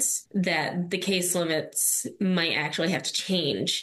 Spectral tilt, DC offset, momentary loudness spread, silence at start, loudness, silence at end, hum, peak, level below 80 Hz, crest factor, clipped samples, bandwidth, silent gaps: -3 dB/octave; under 0.1%; 3 LU; 0 s; -25 LUFS; 0 s; none; -12 dBFS; -70 dBFS; 16 dB; under 0.1%; 13 kHz; none